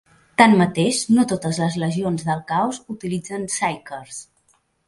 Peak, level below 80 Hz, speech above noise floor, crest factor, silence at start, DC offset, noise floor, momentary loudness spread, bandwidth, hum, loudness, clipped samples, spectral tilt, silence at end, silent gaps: 0 dBFS; -58 dBFS; 43 dB; 20 dB; 0.4 s; under 0.1%; -63 dBFS; 18 LU; 11.5 kHz; none; -20 LUFS; under 0.1%; -5 dB/octave; 0.65 s; none